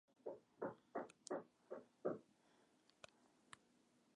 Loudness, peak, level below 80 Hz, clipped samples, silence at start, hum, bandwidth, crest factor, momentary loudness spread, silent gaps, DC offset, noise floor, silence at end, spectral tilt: -52 LUFS; -30 dBFS; under -90 dBFS; under 0.1%; 0.25 s; none; 10.5 kHz; 24 dB; 16 LU; none; under 0.1%; -77 dBFS; 0.6 s; -5 dB/octave